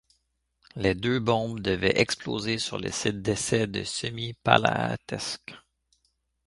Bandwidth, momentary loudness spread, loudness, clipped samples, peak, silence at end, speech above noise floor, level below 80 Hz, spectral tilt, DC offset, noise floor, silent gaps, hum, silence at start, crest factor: 11.5 kHz; 10 LU; -27 LUFS; under 0.1%; 0 dBFS; 0.9 s; 47 dB; -52 dBFS; -4 dB/octave; under 0.1%; -74 dBFS; none; none; 0.75 s; 28 dB